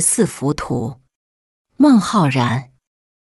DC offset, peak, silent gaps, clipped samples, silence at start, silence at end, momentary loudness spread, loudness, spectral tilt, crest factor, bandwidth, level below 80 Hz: under 0.1%; -2 dBFS; 1.15-1.65 s; under 0.1%; 0 s; 0.7 s; 11 LU; -16 LUFS; -5 dB/octave; 16 dB; 12.5 kHz; -48 dBFS